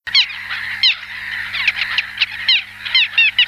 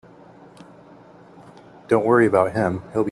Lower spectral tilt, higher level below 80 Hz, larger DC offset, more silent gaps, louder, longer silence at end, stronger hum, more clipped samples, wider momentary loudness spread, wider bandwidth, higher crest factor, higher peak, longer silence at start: second, 1 dB/octave vs -8 dB/octave; about the same, -56 dBFS vs -60 dBFS; neither; neither; first, -15 LUFS vs -19 LUFS; about the same, 0 s vs 0 s; first, 50 Hz at -50 dBFS vs none; neither; about the same, 10 LU vs 8 LU; first, 16 kHz vs 11.5 kHz; about the same, 16 dB vs 20 dB; about the same, -2 dBFS vs -4 dBFS; second, 0.05 s vs 1.9 s